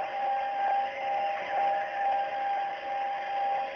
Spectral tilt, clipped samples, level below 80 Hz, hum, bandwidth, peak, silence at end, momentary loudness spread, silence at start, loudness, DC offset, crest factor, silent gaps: 1 dB/octave; under 0.1%; -74 dBFS; none; 6.4 kHz; -20 dBFS; 0 s; 4 LU; 0 s; -30 LUFS; under 0.1%; 10 dB; none